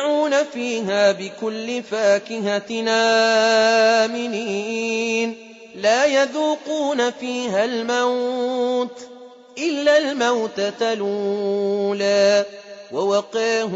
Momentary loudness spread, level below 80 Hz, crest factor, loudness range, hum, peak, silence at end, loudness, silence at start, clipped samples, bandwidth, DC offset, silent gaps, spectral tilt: 11 LU; -70 dBFS; 14 dB; 3 LU; none; -6 dBFS; 0 s; -20 LUFS; 0 s; under 0.1%; 8 kHz; under 0.1%; none; -3 dB/octave